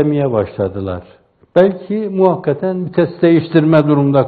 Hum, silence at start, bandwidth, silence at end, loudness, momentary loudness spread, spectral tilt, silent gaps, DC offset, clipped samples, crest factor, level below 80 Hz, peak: none; 0 s; 4.7 kHz; 0 s; -14 LUFS; 9 LU; -10.5 dB/octave; none; under 0.1%; under 0.1%; 14 dB; -52 dBFS; 0 dBFS